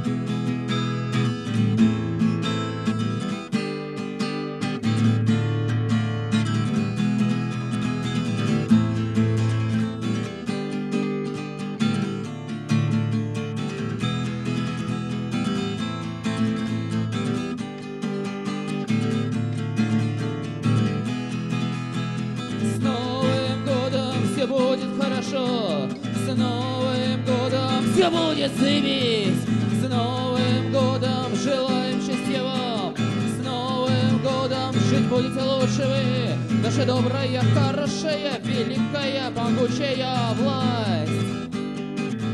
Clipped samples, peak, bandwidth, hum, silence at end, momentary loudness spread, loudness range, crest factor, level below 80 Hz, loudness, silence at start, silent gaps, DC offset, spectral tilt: under 0.1%; -6 dBFS; 12 kHz; none; 0 s; 7 LU; 5 LU; 18 dB; -56 dBFS; -24 LUFS; 0 s; none; under 0.1%; -6.5 dB/octave